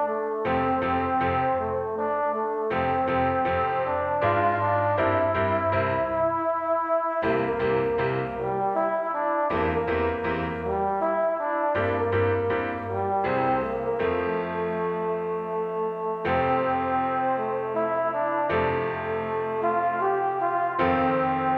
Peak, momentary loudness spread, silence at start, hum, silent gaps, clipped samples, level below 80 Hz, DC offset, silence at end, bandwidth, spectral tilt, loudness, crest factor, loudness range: -10 dBFS; 5 LU; 0 s; none; none; under 0.1%; -50 dBFS; under 0.1%; 0 s; 5.6 kHz; -9 dB/octave; -25 LUFS; 14 dB; 2 LU